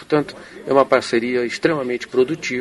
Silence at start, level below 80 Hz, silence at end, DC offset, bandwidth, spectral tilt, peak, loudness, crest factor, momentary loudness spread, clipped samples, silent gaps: 0 s; -58 dBFS; 0 s; under 0.1%; 11.5 kHz; -5 dB/octave; 0 dBFS; -19 LUFS; 20 dB; 7 LU; under 0.1%; none